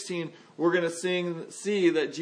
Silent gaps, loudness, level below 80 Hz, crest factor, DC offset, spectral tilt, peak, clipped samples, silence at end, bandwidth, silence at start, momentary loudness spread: none; -28 LUFS; -84 dBFS; 16 dB; under 0.1%; -4.5 dB/octave; -12 dBFS; under 0.1%; 0 s; 10.5 kHz; 0 s; 10 LU